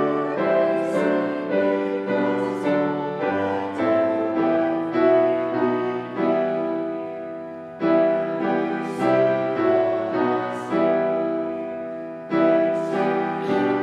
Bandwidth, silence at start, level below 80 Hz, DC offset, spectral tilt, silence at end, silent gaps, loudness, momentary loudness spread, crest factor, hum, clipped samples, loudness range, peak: 10 kHz; 0 s; -66 dBFS; under 0.1%; -7.5 dB/octave; 0 s; none; -22 LUFS; 8 LU; 14 dB; none; under 0.1%; 2 LU; -6 dBFS